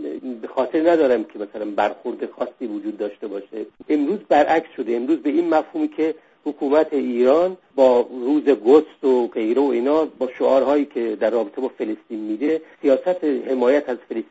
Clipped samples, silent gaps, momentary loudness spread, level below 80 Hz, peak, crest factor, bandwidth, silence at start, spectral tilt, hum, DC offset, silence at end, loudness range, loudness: under 0.1%; none; 12 LU; -64 dBFS; -2 dBFS; 18 dB; 7.8 kHz; 0 s; -6.5 dB/octave; none; under 0.1%; 0.05 s; 5 LU; -20 LUFS